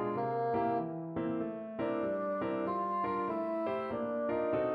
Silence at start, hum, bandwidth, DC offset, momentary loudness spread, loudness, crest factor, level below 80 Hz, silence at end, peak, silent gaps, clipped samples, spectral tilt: 0 s; none; 5.2 kHz; under 0.1%; 5 LU; -35 LUFS; 12 dB; -68 dBFS; 0 s; -22 dBFS; none; under 0.1%; -9.5 dB/octave